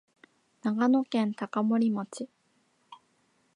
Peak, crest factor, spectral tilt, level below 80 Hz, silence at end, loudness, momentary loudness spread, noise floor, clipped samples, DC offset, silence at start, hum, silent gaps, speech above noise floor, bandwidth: -14 dBFS; 16 dB; -6.5 dB/octave; -86 dBFS; 0.6 s; -28 LUFS; 15 LU; -70 dBFS; under 0.1%; under 0.1%; 0.65 s; none; none; 43 dB; 10.5 kHz